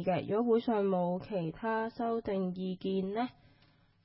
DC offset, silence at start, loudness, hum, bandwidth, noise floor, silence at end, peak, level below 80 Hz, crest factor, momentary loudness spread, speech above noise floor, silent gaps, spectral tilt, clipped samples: under 0.1%; 0 s; -33 LUFS; none; 5.6 kHz; -66 dBFS; 0.75 s; -18 dBFS; -66 dBFS; 16 dB; 8 LU; 34 dB; none; -6.5 dB/octave; under 0.1%